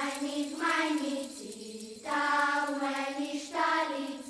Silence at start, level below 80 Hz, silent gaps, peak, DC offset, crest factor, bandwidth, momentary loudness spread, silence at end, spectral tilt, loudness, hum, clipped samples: 0 s; -76 dBFS; none; -16 dBFS; under 0.1%; 16 dB; 11 kHz; 14 LU; 0 s; -2 dB/octave; -31 LUFS; none; under 0.1%